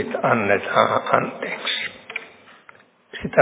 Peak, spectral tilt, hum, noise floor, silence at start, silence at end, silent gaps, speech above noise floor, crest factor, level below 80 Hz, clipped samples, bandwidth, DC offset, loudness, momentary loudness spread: 0 dBFS; -8.5 dB/octave; none; -51 dBFS; 0 s; 0 s; none; 30 dB; 22 dB; -58 dBFS; under 0.1%; 4 kHz; under 0.1%; -21 LUFS; 14 LU